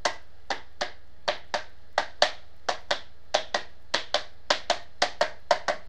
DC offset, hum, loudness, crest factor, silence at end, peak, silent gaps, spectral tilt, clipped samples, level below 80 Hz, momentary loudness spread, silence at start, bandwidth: 2%; none; -30 LUFS; 28 dB; 0.05 s; -4 dBFS; none; -1 dB/octave; under 0.1%; -58 dBFS; 9 LU; 0.05 s; 12 kHz